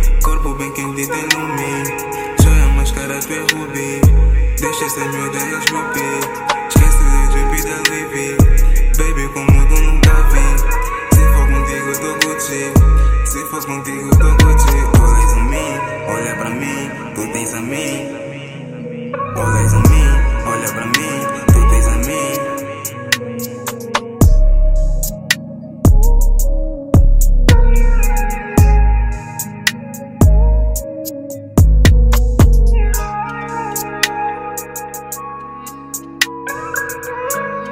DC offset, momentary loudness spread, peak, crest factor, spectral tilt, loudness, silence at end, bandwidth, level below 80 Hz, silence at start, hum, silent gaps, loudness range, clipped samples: under 0.1%; 13 LU; 0 dBFS; 12 dB; -5 dB/octave; -15 LUFS; 0 s; 16.5 kHz; -14 dBFS; 0 s; none; none; 6 LU; under 0.1%